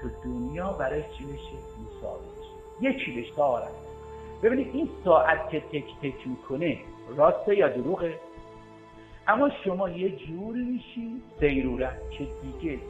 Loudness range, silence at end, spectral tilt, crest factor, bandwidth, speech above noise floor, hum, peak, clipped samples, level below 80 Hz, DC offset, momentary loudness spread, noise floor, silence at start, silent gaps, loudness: 6 LU; 0 s; -7.5 dB/octave; 22 dB; 8.8 kHz; 21 dB; none; -6 dBFS; under 0.1%; -46 dBFS; under 0.1%; 19 LU; -49 dBFS; 0 s; none; -28 LUFS